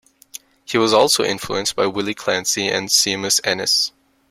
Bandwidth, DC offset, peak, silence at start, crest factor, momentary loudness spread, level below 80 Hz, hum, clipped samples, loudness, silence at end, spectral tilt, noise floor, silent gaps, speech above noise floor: 16.5 kHz; under 0.1%; -2 dBFS; 0.35 s; 18 dB; 12 LU; -58 dBFS; none; under 0.1%; -17 LUFS; 0.4 s; -1.5 dB/octave; -41 dBFS; none; 23 dB